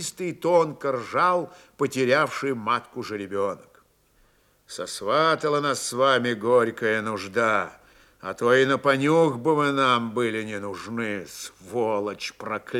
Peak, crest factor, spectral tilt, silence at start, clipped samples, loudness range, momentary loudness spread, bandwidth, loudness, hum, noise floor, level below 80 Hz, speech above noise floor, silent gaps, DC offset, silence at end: -6 dBFS; 18 dB; -4.5 dB/octave; 0 s; under 0.1%; 5 LU; 13 LU; 15.5 kHz; -24 LUFS; none; -62 dBFS; -68 dBFS; 38 dB; none; under 0.1%; 0 s